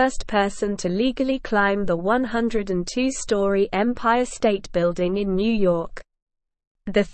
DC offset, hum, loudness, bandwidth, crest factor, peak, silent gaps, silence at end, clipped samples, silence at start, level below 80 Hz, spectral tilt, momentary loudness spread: 0.5%; none; -22 LUFS; 8.8 kHz; 14 dB; -6 dBFS; 6.22-6.27 s, 6.67-6.75 s; 0.05 s; under 0.1%; 0 s; -42 dBFS; -5 dB/octave; 4 LU